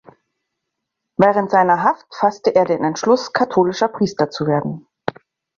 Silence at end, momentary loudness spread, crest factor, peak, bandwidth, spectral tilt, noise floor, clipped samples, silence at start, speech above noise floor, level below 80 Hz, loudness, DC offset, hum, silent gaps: 0.45 s; 14 LU; 16 dB; -2 dBFS; 7.4 kHz; -6 dB/octave; -79 dBFS; under 0.1%; 1.2 s; 62 dB; -60 dBFS; -17 LUFS; under 0.1%; none; none